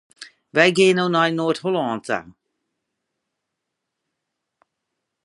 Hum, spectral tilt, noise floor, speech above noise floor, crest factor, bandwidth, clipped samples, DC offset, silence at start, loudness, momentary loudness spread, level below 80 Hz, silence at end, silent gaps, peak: none; -5 dB/octave; -80 dBFS; 62 dB; 22 dB; 11.5 kHz; under 0.1%; under 0.1%; 0.2 s; -19 LUFS; 11 LU; -68 dBFS; 2.95 s; none; 0 dBFS